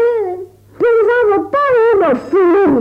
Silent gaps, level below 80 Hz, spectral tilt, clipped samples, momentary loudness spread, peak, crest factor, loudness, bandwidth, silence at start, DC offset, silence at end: none; -50 dBFS; -7.5 dB/octave; under 0.1%; 8 LU; -4 dBFS; 8 dB; -12 LUFS; 5.4 kHz; 0 s; under 0.1%; 0 s